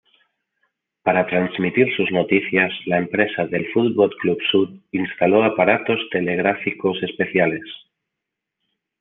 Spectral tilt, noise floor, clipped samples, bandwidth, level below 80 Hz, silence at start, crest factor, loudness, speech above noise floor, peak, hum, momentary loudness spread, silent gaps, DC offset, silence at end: -9 dB/octave; -82 dBFS; under 0.1%; 4 kHz; -66 dBFS; 1.05 s; 20 dB; -19 LUFS; 63 dB; -2 dBFS; none; 7 LU; none; under 0.1%; 1.25 s